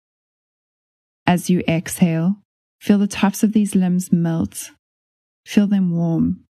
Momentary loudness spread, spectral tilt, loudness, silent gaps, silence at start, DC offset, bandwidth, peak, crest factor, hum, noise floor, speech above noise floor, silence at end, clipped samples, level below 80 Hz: 8 LU; -6.5 dB/octave; -19 LUFS; 2.45-2.79 s, 4.79-5.44 s; 1.25 s; under 0.1%; 13 kHz; -2 dBFS; 18 dB; none; under -90 dBFS; over 72 dB; 0.15 s; under 0.1%; -52 dBFS